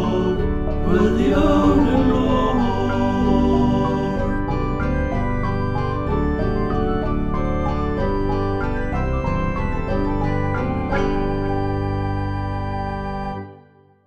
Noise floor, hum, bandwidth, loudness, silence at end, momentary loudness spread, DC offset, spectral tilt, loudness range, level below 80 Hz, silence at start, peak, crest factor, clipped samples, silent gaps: -50 dBFS; none; 8 kHz; -21 LUFS; 0 s; 7 LU; 1%; -8.5 dB/octave; 5 LU; -26 dBFS; 0 s; -4 dBFS; 16 dB; under 0.1%; none